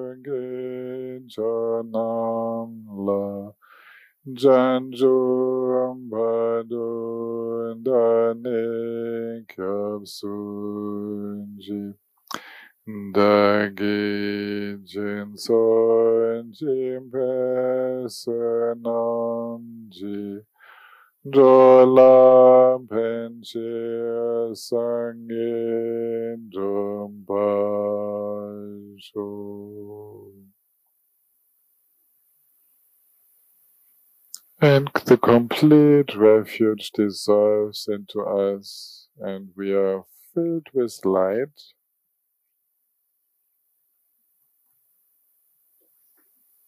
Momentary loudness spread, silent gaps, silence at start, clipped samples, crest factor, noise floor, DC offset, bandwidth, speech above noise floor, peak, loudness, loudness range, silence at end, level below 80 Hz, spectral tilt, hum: 20 LU; none; 0 s; under 0.1%; 18 dB; -74 dBFS; under 0.1%; 15.5 kHz; 53 dB; -4 dBFS; -21 LUFS; 14 LU; 5.2 s; -74 dBFS; -7 dB/octave; none